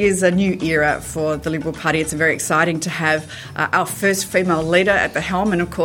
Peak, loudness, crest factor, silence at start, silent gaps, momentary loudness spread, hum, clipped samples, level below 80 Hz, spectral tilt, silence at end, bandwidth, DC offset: -2 dBFS; -18 LUFS; 16 dB; 0 s; none; 6 LU; none; under 0.1%; -44 dBFS; -4.5 dB/octave; 0 s; 17 kHz; under 0.1%